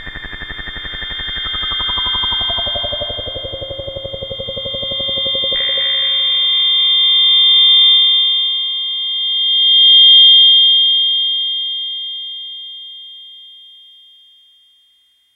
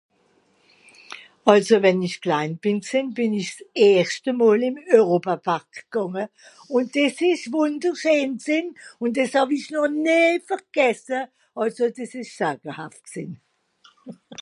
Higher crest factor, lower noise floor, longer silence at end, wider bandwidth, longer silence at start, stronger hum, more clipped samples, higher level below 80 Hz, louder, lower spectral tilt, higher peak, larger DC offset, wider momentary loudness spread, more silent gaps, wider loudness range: second, 14 dB vs 22 dB; second, -56 dBFS vs -63 dBFS; first, 1.8 s vs 0.05 s; second, 3.9 kHz vs 11.5 kHz; second, 0 s vs 1.1 s; neither; neither; first, -40 dBFS vs -74 dBFS; first, -10 LUFS vs -21 LUFS; second, -3.5 dB/octave vs -5 dB/octave; about the same, 0 dBFS vs 0 dBFS; neither; first, 20 LU vs 17 LU; neither; first, 11 LU vs 5 LU